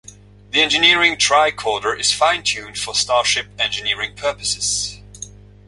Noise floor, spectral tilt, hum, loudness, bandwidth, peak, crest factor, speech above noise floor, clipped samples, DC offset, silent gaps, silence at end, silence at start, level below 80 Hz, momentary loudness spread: -42 dBFS; -0.5 dB/octave; 50 Hz at -40 dBFS; -17 LUFS; 11.5 kHz; -2 dBFS; 18 dB; 24 dB; under 0.1%; under 0.1%; none; 0.4 s; 0.55 s; -48 dBFS; 12 LU